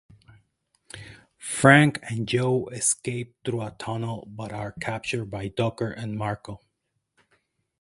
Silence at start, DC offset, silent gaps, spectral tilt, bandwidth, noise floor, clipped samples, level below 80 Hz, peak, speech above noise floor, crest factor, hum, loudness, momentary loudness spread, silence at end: 0.95 s; under 0.1%; none; -4.5 dB/octave; 11.5 kHz; -78 dBFS; under 0.1%; -58 dBFS; 0 dBFS; 53 dB; 26 dB; none; -25 LUFS; 22 LU; 1.25 s